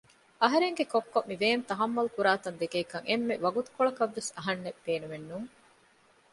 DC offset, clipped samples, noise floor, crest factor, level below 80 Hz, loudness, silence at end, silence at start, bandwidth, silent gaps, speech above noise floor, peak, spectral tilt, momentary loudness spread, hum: under 0.1%; under 0.1%; -64 dBFS; 22 dB; -74 dBFS; -30 LUFS; 0.85 s; 0.4 s; 11.5 kHz; none; 34 dB; -8 dBFS; -4 dB/octave; 8 LU; none